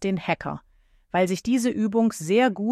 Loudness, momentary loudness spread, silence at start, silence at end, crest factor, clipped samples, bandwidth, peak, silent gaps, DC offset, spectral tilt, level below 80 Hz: -24 LUFS; 7 LU; 0 s; 0 s; 16 dB; under 0.1%; 14 kHz; -8 dBFS; none; under 0.1%; -5.5 dB/octave; -58 dBFS